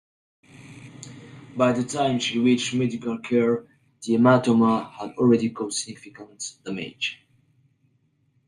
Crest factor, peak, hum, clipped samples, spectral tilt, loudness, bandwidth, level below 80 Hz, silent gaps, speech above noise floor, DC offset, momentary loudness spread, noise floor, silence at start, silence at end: 20 dB; -6 dBFS; none; under 0.1%; -5 dB/octave; -23 LUFS; 11 kHz; -66 dBFS; none; 44 dB; under 0.1%; 23 LU; -67 dBFS; 0.65 s; 1.35 s